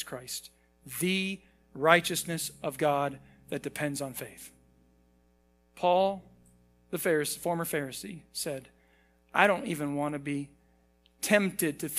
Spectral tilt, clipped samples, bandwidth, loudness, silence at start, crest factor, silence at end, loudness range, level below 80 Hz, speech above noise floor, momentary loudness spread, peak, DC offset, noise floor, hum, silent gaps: -4 dB/octave; under 0.1%; 16 kHz; -30 LUFS; 0 s; 28 dB; 0 s; 5 LU; -66 dBFS; 37 dB; 16 LU; -4 dBFS; under 0.1%; -67 dBFS; none; none